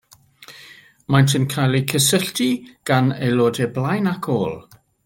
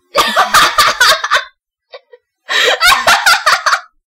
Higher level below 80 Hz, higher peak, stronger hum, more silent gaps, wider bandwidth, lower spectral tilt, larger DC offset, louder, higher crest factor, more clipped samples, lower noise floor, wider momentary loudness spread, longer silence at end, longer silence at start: second, -56 dBFS vs -44 dBFS; about the same, 0 dBFS vs 0 dBFS; neither; neither; about the same, 17 kHz vs 18 kHz; first, -5 dB/octave vs 0.5 dB/octave; neither; second, -19 LUFS vs -9 LUFS; first, 20 dB vs 12 dB; neither; about the same, -46 dBFS vs -46 dBFS; first, 10 LU vs 7 LU; first, 0.45 s vs 0.25 s; first, 0.4 s vs 0.15 s